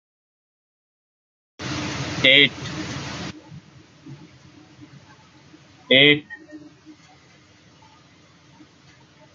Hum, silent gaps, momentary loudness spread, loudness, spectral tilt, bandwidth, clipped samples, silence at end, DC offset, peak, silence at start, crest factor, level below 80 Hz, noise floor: none; none; 23 LU; -18 LUFS; -3.5 dB/octave; 7.6 kHz; under 0.1%; 2.45 s; under 0.1%; 0 dBFS; 1.6 s; 26 dB; -62 dBFS; -53 dBFS